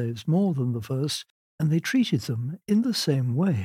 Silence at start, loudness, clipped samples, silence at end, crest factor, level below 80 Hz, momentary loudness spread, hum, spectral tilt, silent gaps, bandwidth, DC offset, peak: 0 s; -26 LUFS; under 0.1%; 0 s; 14 dB; -68 dBFS; 6 LU; none; -6 dB/octave; 1.30-1.58 s; 16 kHz; under 0.1%; -10 dBFS